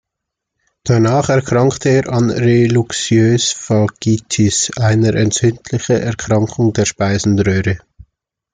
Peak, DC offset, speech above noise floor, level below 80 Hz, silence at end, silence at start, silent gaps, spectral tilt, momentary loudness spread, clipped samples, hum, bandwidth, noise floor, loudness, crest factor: -2 dBFS; under 0.1%; 66 dB; -44 dBFS; 0.75 s; 0.85 s; none; -5.5 dB/octave; 4 LU; under 0.1%; none; 9.6 kHz; -79 dBFS; -14 LUFS; 12 dB